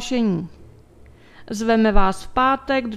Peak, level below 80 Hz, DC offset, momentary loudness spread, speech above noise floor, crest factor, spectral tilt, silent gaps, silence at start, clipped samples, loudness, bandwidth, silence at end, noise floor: -2 dBFS; -32 dBFS; under 0.1%; 11 LU; 29 dB; 18 dB; -5.5 dB/octave; none; 0 s; under 0.1%; -20 LUFS; 12.5 kHz; 0 s; -47 dBFS